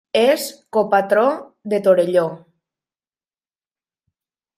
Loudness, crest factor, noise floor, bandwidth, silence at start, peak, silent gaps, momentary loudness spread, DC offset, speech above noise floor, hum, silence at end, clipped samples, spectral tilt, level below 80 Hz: -18 LUFS; 18 dB; under -90 dBFS; 16 kHz; 0.15 s; -2 dBFS; none; 8 LU; under 0.1%; over 73 dB; none; 2.2 s; under 0.1%; -4.5 dB/octave; -70 dBFS